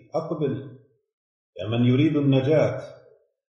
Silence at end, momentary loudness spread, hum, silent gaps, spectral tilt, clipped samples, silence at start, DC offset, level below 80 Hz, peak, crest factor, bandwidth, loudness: 0.65 s; 16 LU; none; 1.13-1.53 s; -9 dB/octave; under 0.1%; 0.15 s; under 0.1%; -62 dBFS; -8 dBFS; 16 dB; 6.8 kHz; -22 LUFS